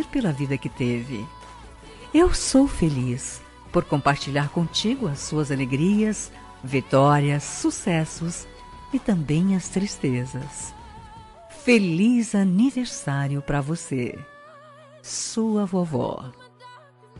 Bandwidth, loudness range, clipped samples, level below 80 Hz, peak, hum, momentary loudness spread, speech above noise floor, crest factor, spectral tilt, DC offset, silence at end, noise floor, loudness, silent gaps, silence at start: 11.5 kHz; 4 LU; under 0.1%; -42 dBFS; -6 dBFS; none; 19 LU; 26 dB; 18 dB; -5.5 dB/octave; under 0.1%; 0 s; -48 dBFS; -23 LUFS; none; 0 s